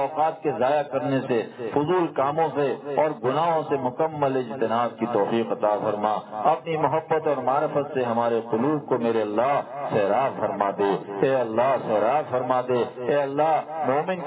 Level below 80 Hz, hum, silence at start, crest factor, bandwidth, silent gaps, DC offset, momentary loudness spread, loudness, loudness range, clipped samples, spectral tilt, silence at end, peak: -68 dBFS; none; 0 s; 16 dB; 4 kHz; none; under 0.1%; 3 LU; -24 LUFS; 1 LU; under 0.1%; -10.5 dB/octave; 0 s; -6 dBFS